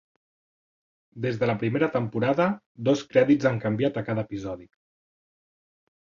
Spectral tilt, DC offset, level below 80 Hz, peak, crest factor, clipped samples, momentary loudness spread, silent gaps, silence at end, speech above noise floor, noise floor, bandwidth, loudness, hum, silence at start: -7.5 dB/octave; under 0.1%; -62 dBFS; -6 dBFS; 20 dB; under 0.1%; 11 LU; 2.66-2.75 s; 1.5 s; over 65 dB; under -90 dBFS; 7.4 kHz; -25 LUFS; none; 1.15 s